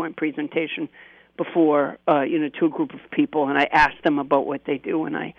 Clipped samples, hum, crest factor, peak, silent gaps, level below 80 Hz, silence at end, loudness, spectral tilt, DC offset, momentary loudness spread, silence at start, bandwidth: under 0.1%; none; 16 dB; -6 dBFS; none; -54 dBFS; 0.1 s; -22 LUFS; -7 dB/octave; under 0.1%; 9 LU; 0 s; 7 kHz